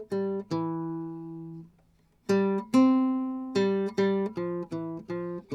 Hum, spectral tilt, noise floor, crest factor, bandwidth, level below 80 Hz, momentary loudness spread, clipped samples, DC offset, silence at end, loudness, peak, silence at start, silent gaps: none; -7.5 dB/octave; -64 dBFS; 16 dB; 11.5 kHz; -68 dBFS; 17 LU; under 0.1%; under 0.1%; 0 s; -28 LUFS; -12 dBFS; 0 s; none